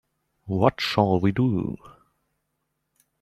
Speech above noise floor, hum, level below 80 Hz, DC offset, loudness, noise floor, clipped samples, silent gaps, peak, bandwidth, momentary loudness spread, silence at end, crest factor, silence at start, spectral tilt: 55 dB; none; -56 dBFS; under 0.1%; -23 LUFS; -77 dBFS; under 0.1%; none; -2 dBFS; 13.5 kHz; 11 LU; 1.3 s; 24 dB; 0.45 s; -7 dB/octave